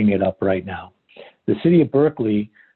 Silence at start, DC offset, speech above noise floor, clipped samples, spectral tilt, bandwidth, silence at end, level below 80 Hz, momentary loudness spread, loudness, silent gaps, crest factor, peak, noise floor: 0 s; under 0.1%; 28 dB; under 0.1%; -11.5 dB/octave; 4.3 kHz; 0.3 s; -50 dBFS; 15 LU; -19 LUFS; none; 14 dB; -4 dBFS; -46 dBFS